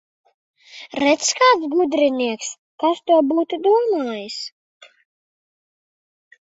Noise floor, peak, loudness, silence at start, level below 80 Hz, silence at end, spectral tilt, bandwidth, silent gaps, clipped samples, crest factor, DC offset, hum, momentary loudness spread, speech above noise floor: under -90 dBFS; -2 dBFS; -18 LUFS; 0.75 s; -68 dBFS; 2.1 s; -2 dB/octave; 8 kHz; 2.58-2.78 s; under 0.1%; 18 dB; under 0.1%; none; 15 LU; over 72 dB